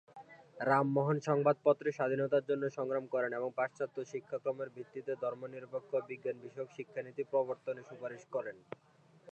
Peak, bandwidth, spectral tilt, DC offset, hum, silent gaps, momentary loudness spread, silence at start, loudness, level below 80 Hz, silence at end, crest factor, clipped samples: -16 dBFS; 8.6 kHz; -7.5 dB/octave; under 0.1%; none; none; 15 LU; 0.15 s; -36 LUFS; -86 dBFS; 0 s; 20 dB; under 0.1%